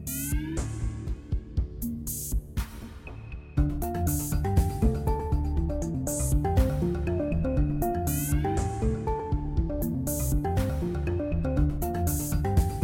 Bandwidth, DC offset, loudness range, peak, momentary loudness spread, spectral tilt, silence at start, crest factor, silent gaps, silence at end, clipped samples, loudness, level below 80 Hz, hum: 17 kHz; under 0.1%; 5 LU; -12 dBFS; 8 LU; -6.5 dB/octave; 0 s; 14 dB; none; 0 s; under 0.1%; -29 LUFS; -32 dBFS; none